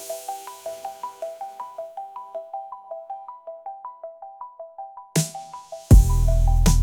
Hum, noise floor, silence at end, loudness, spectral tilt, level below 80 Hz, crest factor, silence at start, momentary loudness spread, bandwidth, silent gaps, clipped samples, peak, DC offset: none; -40 dBFS; 0 s; -24 LUFS; -5.5 dB/octave; -24 dBFS; 20 dB; 0 s; 22 LU; 18.5 kHz; none; under 0.1%; -4 dBFS; under 0.1%